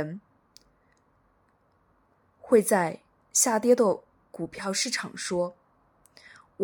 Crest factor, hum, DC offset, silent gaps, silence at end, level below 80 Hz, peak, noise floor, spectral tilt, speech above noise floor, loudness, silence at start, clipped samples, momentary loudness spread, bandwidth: 22 dB; none; under 0.1%; none; 0 s; -70 dBFS; -6 dBFS; -67 dBFS; -3 dB/octave; 42 dB; -26 LUFS; 0 s; under 0.1%; 17 LU; 19 kHz